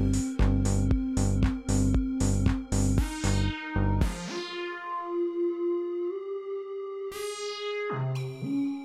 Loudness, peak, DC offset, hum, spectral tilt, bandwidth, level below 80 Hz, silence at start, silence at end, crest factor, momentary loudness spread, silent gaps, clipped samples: -29 LUFS; -12 dBFS; under 0.1%; none; -6 dB/octave; 13.5 kHz; -34 dBFS; 0 s; 0 s; 16 dB; 9 LU; none; under 0.1%